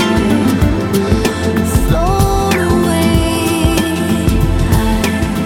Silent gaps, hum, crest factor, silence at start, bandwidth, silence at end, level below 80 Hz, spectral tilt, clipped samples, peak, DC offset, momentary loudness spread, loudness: none; none; 12 dB; 0 s; 17 kHz; 0 s; -20 dBFS; -5.5 dB/octave; under 0.1%; 0 dBFS; under 0.1%; 2 LU; -13 LUFS